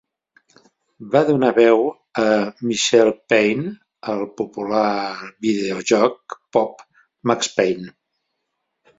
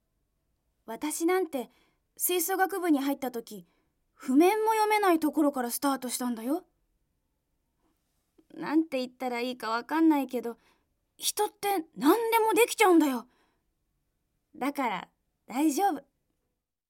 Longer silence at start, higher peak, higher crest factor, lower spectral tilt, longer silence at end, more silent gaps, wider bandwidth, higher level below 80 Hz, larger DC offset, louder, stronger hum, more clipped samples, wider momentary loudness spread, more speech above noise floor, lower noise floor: about the same, 1 s vs 0.9 s; first, -2 dBFS vs -8 dBFS; about the same, 18 dB vs 22 dB; first, -4.5 dB/octave vs -2.5 dB/octave; first, 1.1 s vs 0.9 s; neither; second, 8 kHz vs 17 kHz; first, -62 dBFS vs -76 dBFS; neither; first, -19 LUFS vs -28 LUFS; neither; neither; about the same, 12 LU vs 14 LU; about the same, 57 dB vs 55 dB; second, -76 dBFS vs -82 dBFS